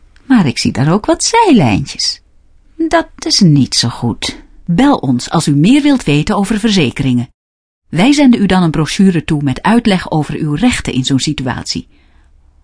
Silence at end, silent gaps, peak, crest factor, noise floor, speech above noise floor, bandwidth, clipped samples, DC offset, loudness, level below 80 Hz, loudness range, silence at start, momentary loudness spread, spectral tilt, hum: 0.8 s; 7.34-7.82 s; 0 dBFS; 12 dB; -45 dBFS; 34 dB; 11 kHz; under 0.1%; under 0.1%; -12 LUFS; -36 dBFS; 2 LU; 0.3 s; 9 LU; -5 dB/octave; none